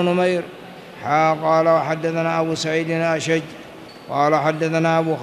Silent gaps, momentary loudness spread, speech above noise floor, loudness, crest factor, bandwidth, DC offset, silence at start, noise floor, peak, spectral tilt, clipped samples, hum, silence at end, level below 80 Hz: none; 19 LU; 20 dB; -19 LUFS; 16 dB; 13.5 kHz; under 0.1%; 0 s; -39 dBFS; -4 dBFS; -5.5 dB/octave; under 0.1%; none; 0 s; -64 dBFS